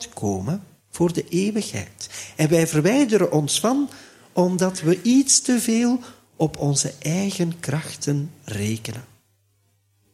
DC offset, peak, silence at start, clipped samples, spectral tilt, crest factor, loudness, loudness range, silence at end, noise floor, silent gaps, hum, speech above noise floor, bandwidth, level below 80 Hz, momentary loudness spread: under 0.1%; -2 dBFS; 0 s; under 0.1%; -4.5 dB/octave; 20 dB; -22 LUFS; 6 LU; 1.1 s; -65 dBFS; none; none; 44 dB; 15.5 kHz; -58 dBFS; 13 LU